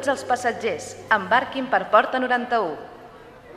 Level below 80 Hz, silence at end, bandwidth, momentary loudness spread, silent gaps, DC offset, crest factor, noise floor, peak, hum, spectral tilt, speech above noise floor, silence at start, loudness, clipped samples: -60 dBFS; 0 s; 14 kHz; 11 LU; none; under 0.1%; 20 dB; -44 dBFS; -2 dBFS; none; -3.5 dB/octave; 22 dB; 0 s; -22 LUFS; under 0.1%